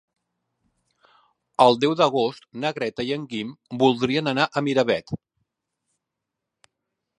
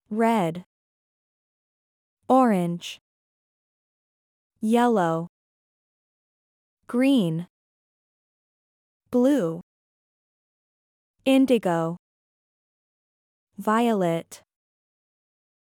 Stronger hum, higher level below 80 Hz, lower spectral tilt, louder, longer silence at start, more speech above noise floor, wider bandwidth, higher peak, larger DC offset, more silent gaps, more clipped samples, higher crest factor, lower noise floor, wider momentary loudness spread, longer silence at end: neither; first, -64 dBFS vs -76 dBFS; about the same, -5.5 dB/octave vs -6.5 dB/octave; about the same, -22 LUFS vs -23 LUFS; first, 1.6 s vs 0.1 s; second, 62 dB vs over 68 dB; second, 11 kHz vs 17 kHz; first, -2 dBFS vs -8 dBFS; neither; second, none vs 0.66-2.17 s, 3.01-4.50 s, 5.29-6.77 s, 7.50-9.00 s, 9.63-11.14 s, 11.99-13.47 s; neither; first, 24 dB vs 18 dB; second, -84 dBFS vs under -90 dBFS; second, 14 LU vs 17 LU; first, 2.05 s vs 1.35 s